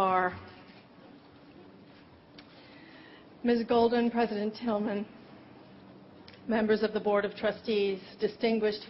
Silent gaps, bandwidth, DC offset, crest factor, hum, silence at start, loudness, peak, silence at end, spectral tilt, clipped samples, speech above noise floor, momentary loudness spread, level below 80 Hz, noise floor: none; 5.8 kHz; under 0.1%; 18 dB; none; 0 s; -30 LUFS; -14 dBFS; 0 s; -4 dB/octave; under 0.1%; 26 dB; 25 LU; -66 dBFS; -55 dBFS